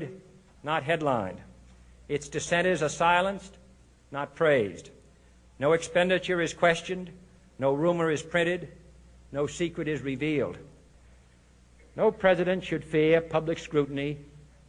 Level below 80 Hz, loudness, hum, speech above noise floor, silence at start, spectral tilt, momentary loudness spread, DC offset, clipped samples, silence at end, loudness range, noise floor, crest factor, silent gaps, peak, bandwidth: -56 dBFS; -27 LUFS; none; 31 dB; 0 s; -5 dB/octave; 15 LU; under 0.1%; under 0.1%; 0.3 s; 4 LU; -58 dBFS; 20 dB; none; -8 dBFS; 10.5 kHz